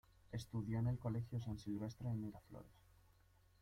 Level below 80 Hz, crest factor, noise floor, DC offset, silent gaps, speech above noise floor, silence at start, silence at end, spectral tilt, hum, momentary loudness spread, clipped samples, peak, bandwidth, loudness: -64 dBFS; 16 dB; -72 dBFS; under 0.1%; none; 27 dB; 0.25 s; 0.9 s; -8 dB/octave; none; 17 LU; under 0.1%; -30 dBFS; 13.5 kHz; -45 LUFS